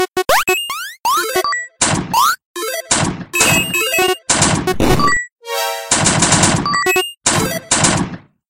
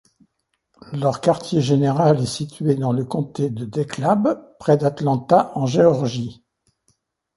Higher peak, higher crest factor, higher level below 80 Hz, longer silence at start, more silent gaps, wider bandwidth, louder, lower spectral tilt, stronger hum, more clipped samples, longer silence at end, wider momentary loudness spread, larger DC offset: about the same, 0 dBFS vs -2 dBFS; about the same, 16 dB vs 18 dB; first, -36 dBFS vs -58 dBFS; second, 0 s vs 0.9 s; first, 2.45-2.54 s, 5.32-5.36 s vs none; first, 17 kHz vs 11.5 kHz; first, -14 LUFS vs -20 LUFS; second, -2.5 dB/octave vs -7 dB/octave; neither; neither; second, 0.3 s vs 1.05 s; about the same, 8 LU vs 9 LU; neither